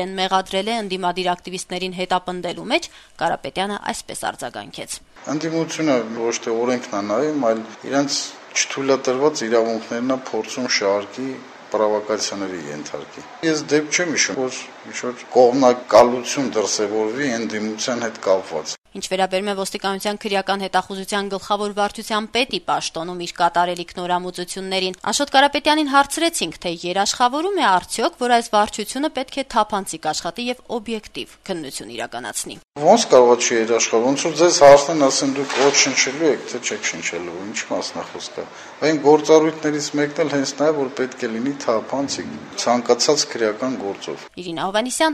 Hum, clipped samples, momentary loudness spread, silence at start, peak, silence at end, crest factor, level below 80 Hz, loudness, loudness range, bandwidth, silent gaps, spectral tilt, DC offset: none; under 0.1%; 13 LU; 0 s; 0 dBFS; 0 s; 20 dB; -56 dBFS; -20 LUFS; 8 LU; 13.5 kHz; 18.78-18.82 s; -3 dB/octave; under 0.1%